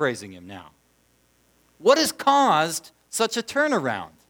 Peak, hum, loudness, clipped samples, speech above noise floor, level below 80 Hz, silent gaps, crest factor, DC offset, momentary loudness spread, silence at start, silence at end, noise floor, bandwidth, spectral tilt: -4 dBFS; 60 Hz at -65 dBFS; -22 LUFS; under 0.1%; 41 dB; -68 dBFS; none; 20 dB; under 0.1%; 21 LU; 0 s; 0.25 s; -63 dBFS; over 20 kHz; -3 dB/octave